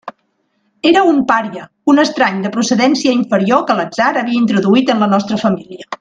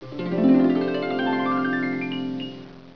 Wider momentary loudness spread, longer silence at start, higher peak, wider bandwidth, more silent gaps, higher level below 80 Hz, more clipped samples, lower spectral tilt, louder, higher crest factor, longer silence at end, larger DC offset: second, 6 LU vs 13 LU; about the same, 0.05 s vs 0 s; first, 0 dBFS vs -8 dBFS; first, 9.4 kHz vs 5.4 kHz; neither; about the same, -58 dBFS vs -62 dBFS; neither; second, -5 dB/octave vs -8 dB/octave; first, -13 LUFS vs -23 LUFS; about the same, 14 dB vs 16 dB; about the same, 0.05 s vs 0.05 s; second, under 0.1% vs 0.4%